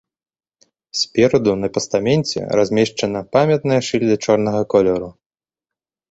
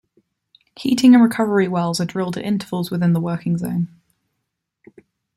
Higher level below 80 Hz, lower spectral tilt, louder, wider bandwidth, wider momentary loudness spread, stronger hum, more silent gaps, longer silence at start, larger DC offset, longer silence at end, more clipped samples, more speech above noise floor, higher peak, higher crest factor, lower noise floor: first, -52 dBFS vs -60 dBFS; about the same, -5.5 dB/octave vs -6.5 dB/octave; about the same, -17 LUFS vs -18 LUFS; second, 8.2 kHz vs 13.5 kHz; second, 6 LU vs 12 LU; neither; neither; first, 0.95 s vs 0.8 s; neither; second, 1 s vs 1.5 s; neither; first, 72 dB vs 60 dB; about the same, -2 dBFS vs -2 dBFS; about the same, 16 dB vs 18 dB; first, -89 dBFS vs -77 dBFS